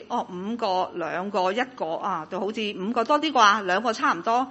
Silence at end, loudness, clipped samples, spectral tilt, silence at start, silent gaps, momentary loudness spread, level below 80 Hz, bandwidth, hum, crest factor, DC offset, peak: 0 s; -24 LUFS; under 0.1%; -3.5 dB/octave; 0 s; none; 11 LU; -70 dBFS; 8.4 kHz; none; 22 dB; under 0.1%; -4 dBFS